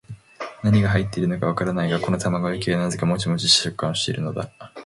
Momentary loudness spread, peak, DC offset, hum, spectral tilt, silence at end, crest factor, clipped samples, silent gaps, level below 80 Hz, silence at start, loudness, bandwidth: 11 LU; -4 dBFS; under 0.1%; none; -4.5 dB/octave; 0 s; 18 dB; under 0.1%; none; -46 dBFS; 0.1 s; -22 LUFS; 11.5 kHz